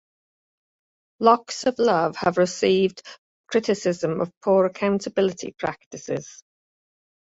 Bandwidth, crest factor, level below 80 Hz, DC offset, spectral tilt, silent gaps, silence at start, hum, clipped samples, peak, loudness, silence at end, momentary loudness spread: 8 kHz; 22 dB; -64 dBFS; under 0.1%; -5 dB/octave; 3.18-3.44 s, 4.37-4.41 s, 5.86-5.91 s; 1.2 s; none; under 0.1%; -2 dBFS; -23 LUFS; 0.9 s; 11 LU